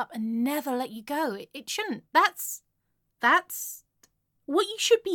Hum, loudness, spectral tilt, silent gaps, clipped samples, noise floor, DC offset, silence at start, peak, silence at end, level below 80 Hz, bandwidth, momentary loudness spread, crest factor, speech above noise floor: none; -27 LUFS; -2 dB/octave; none; under 0.1%; -76 dBFS; under 0.1%; 0 s; -8 dBFS; 0 s; -78 dBFS; 17.5 kHz; 14 LU; 20 dB; 49 dB